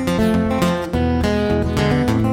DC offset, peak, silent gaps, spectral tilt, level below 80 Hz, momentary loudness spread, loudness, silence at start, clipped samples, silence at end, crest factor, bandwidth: under 0.1%; -4 dBFS; none; -6.5 dB/octave; -30 dBFS; 2 LU; -18 LUFS; 0 s; under 0.1%; 0 s; 12 dB; 16.5 kHz